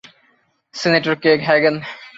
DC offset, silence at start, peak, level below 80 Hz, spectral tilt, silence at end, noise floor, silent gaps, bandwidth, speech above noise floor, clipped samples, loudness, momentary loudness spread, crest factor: under 0.1%; 0.75 s; -2 dBFS; -62 dBFS; -5 dB/octave; 0.1 s; -61 dBFS; none; 7.8 kHz; 44 dB; under 0.1%; -16 LUFS; 12 LU; 16 dB